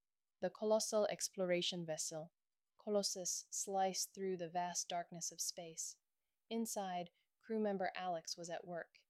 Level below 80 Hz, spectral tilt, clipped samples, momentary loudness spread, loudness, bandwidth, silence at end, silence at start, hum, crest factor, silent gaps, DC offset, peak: under -90 dBFS; -3 dB/octave; under 0.1%; 9 LU; -41 LUFS; 16 kHz; 0.1 s; 0.4 s; none; 18 dB; none; under 0.1%; -24 dBFS